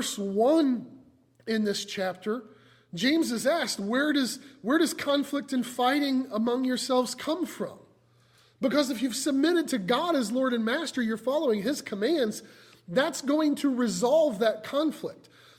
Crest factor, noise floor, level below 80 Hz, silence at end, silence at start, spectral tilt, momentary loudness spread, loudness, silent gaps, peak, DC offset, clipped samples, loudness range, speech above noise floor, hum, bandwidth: 16 dB; -62 dBFS; -72 dBFS; 0.45 s; 0 s; -4 dB/octave; 8 LU; -27 LUFS; none; -12 dBFS; under 0.1%; under 0.1%; 2 LU; 35 dB; none; 16.5 kHz